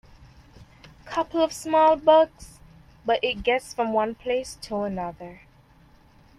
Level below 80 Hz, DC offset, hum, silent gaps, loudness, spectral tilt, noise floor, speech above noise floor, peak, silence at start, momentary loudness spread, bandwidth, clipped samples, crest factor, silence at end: -52 dBFS; under 0.1%; none; none; -24 LUFS; -4 dB/octave; -55 dBFS; 32 dB; -6 dBFS; 0.6 s; 14 LU; 14 kHz; under 0.1%; 20 dB; 1.05 s